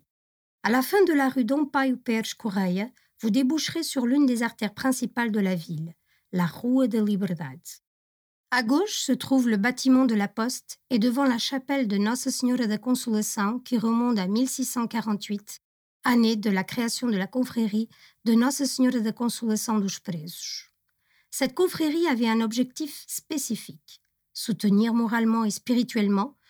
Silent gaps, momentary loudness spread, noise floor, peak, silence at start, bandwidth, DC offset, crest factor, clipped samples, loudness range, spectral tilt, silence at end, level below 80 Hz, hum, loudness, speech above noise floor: 7.87-8.44 s, 15.64-16.00 s; 11 LU; -70 dBFS; -10 dBFS; 0.65 s; over 20 kHz; under 0.1%; 14 dB; under 0.1%; 3 LU; -4.5 dB/octave; 0.2 s; -74 dBFS; none; -25 LUFS; 45 dB